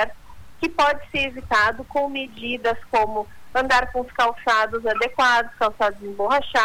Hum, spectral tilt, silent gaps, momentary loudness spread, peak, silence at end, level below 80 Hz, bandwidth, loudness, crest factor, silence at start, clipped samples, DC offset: none; -3 dB/octave; none; 8 LU; -8 dBFS; 0 s; -46 dBFS; 19 kHz; -22 LUFS; 14 dB; 0 s; under 0.1%; under 0.1%